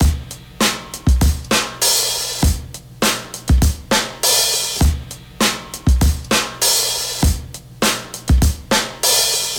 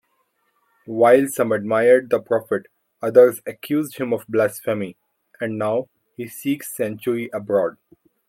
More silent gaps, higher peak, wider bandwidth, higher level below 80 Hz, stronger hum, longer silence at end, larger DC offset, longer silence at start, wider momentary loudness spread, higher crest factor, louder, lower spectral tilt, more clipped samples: neither; second, -4 dBFS vs 0 dBFS; first, over 20 kHz vs 16.5 kHz; first, -22 dBFS vs -70 dBFS; neither; second, 0 s vs 0.6 s; neither; second, 0 s vs 0.9 s; second, 10 LU vs 14 LU; second, 14 dB vs 20 dB; first, -17 LUFS vs -20 LUFS; second, -3 dB/octave vs -5.5 dB/octave; neither